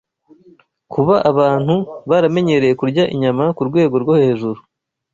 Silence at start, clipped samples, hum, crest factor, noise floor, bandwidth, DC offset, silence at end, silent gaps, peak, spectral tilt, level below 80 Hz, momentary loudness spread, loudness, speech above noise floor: 0.9 s; under 0.1%; none; 14 dB; -50 dBFS; 7.6 kHz; under 0.1%; 0.6 s; none; -2 dBFS; -8 dB/octave; -54 dBFS; 6 LU; -15 LUFS; 36 dB